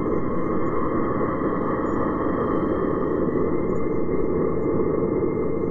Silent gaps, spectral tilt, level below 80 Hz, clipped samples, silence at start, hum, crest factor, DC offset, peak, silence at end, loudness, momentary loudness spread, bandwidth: none; -11 dB/octave; -40 dBFS; under 0.1%; 0 s; none; 12 dB; under 0.1%; -10 dBFS; 0 s; -24 LUFS; 2 LU; 7.2 kHz